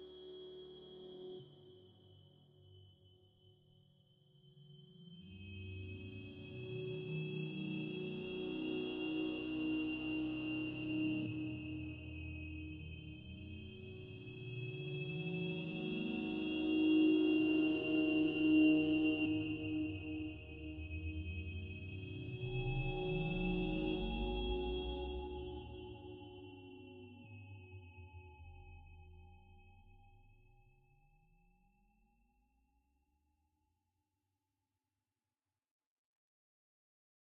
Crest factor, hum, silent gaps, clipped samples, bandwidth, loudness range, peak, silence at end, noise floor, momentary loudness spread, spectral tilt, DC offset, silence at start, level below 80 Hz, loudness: 20 dB; none; none; under 0.1%; 4.4 kHz; 23 LU; -22 dBFS; 7 s; under -90 dBFS; 22 LU; -5.5 dB/octave; under 0.1%; 0 s; -56 dBFS; -39 LUFS